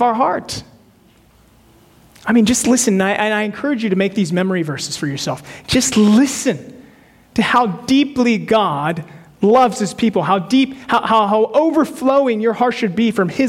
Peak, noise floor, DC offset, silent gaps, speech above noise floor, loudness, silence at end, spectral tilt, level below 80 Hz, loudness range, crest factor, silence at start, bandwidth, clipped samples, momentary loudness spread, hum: -4 dBFS; -50 dBFS; under 0.1%; none; 35 dB; -16 LUFS; 0 s; -4.5 dB/octave; -50 dBFS; 2 LU; 12 dB; 0 s; 16 kHz; under 0.1%; 9 LU; none